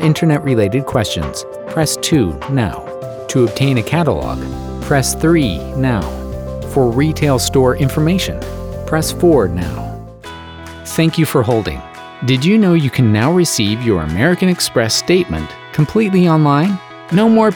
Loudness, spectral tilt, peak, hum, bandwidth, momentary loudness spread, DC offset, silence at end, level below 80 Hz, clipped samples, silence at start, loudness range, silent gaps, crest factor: -15 LUFS; -5.5 dB/octave; -2 dBFS; none; over 20 kHz; 13 LU; under 0.1%; 0 s; -34 dBFS; under 0.1%; 0 s; 3 LU; none; 14 dB